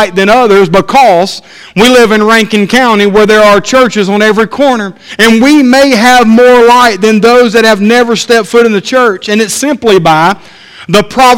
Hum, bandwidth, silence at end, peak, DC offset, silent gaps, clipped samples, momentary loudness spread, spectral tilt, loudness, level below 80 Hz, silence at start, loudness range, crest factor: none; 17 kHz; 0 s; 0 dBFS; under 0.1%; none; 6%; 6 LU; -4 dB/octave; -5 LUFS; -38 dBFS; 0 s; 3 LU; 6 dB